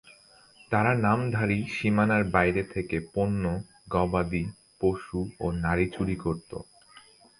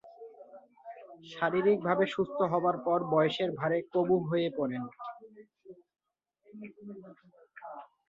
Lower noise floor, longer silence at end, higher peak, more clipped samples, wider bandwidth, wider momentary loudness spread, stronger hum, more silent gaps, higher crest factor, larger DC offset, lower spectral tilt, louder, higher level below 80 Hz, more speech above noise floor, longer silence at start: second, -56 dBFS vs -71 dBFS; first, 0.4 s vs 0.25 s; first, -6 dBFS vs -12 dBFS; neither; first, 11 kHz vs 7.6 kHz; second, 9 LU vs 22 LU; neither; neither; about the same, 22 dB vs 20 dB; neither; about the same, -7.5 dB/octave vs -7.5 dB/octave; first, -27 LUFS vs -30 LUFS; first, -46 dBFS vs -74 dBFS; second, 30 dB vs 41 dB; about the same, 0.05 s vs 0.05 s